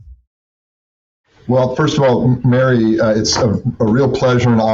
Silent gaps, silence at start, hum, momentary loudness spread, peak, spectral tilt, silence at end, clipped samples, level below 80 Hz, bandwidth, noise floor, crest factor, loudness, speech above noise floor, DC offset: 0.27-1.24 s; 0.05 s; none; 4 LU; -4 dBFS; -6 dB/octave; 0 s; under 0.1%; -42 dBFS; 7.8 kHz; under -90 dBFS; 10 dB; -14 LUFS; over 77 dB; under 0.1%